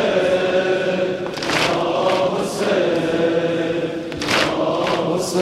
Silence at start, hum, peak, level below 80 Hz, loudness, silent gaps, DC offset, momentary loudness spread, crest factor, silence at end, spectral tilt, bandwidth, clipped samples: 0 s; none; -2 dBFS; -52 dBFS; -19 LUFS; none; under 0.1%; 5 LU; 18 dB; 0 s; -4.5 dB/octave; 15 kHz; under 0.1%